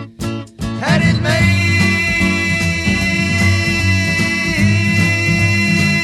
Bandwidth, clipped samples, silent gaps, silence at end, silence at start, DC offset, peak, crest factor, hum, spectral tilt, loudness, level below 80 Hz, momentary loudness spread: 13.5 kHz; under 0.1%; none; 0 s; 0 s; under 0.1%; 0 dBFS; 14 dB; none; -5 dB/octave; -14 LUFS; -34 dBFS; 5 LU